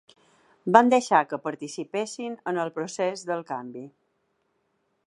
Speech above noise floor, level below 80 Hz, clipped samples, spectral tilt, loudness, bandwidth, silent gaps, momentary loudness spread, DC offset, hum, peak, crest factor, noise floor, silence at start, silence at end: 48 dB; -76 dBFS; under 0.1%; -4.5 dB/octave; -25 LUFS; 11.5 kHz; none; 16 LU; under 0.1%; none; 0 dBFS; 26 dB; -73 dBFS; 0.65 s; 1.2 s